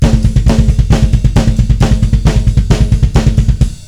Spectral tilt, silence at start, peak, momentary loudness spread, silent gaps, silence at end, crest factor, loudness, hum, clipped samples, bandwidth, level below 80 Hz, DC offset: -7 dB/octave; 0 s; 0 dBFS; 1 LU; none; 0 s; 8 dB; -11 LUFS; none; 3%; 11.5 kHz; -12 dBFS; 2%